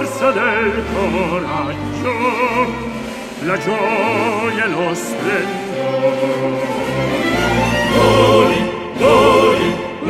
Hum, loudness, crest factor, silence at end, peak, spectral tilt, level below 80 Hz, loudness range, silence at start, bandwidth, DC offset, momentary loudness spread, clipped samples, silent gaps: none; -16 LUFS; 16 dB; 0 s; 0 dBFS; -5 dB/octave; -38 dBFS; 5 LU; 0 s; 16 kHz; under 0.1%; 10 LU; under 0.1%; none